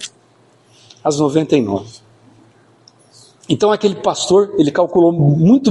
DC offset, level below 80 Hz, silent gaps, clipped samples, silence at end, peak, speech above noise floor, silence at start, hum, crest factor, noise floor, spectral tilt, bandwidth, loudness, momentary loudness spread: under 0.1%; -54 dBFS; none; under 0.1%; 0 s; -2 dBFS; 38 dB; 0 s; none; 14 dB; -52 dBFS; -6.5 dB/octave; 11.5 kHz; -15 LUFS; 10 LU